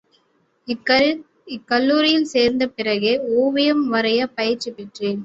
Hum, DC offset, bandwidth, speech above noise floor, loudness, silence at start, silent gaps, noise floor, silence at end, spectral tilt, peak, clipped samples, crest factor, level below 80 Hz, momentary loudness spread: none; under 0.1%; 8 kHz; 44 dB; -19 LUFS; 0.7 s; none; -63 dBFS; 0 s; -4.5 dB/octave; -4 dBFS; under 0.1%; 16 dB; -60 dBFS; 14 LU